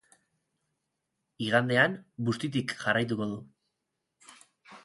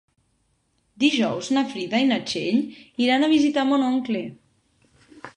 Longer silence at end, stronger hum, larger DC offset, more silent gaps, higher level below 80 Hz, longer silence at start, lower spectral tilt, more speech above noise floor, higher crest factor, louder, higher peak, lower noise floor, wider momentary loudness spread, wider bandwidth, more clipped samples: about the same, 0.05 s vs 0.05 s; neither; neither; neither; about the same, -70 dBFS vs -66 dBFS; first, 1.4 s vs 1 s; about the same, -5.5 dB/octave vs -4.5 dB/octave; first, 55 dB vs 47 dB; first, 24 dB vs 18 dB; second, -29 LUFS vs -22 LUFS; about the same, -8 dBFS vs -6 dBFS; first, -83 dBFS vs -68 dBFS; first, 11 LU vs 8 LU; first, 11.5 kHz vs 9.8 kHz; neither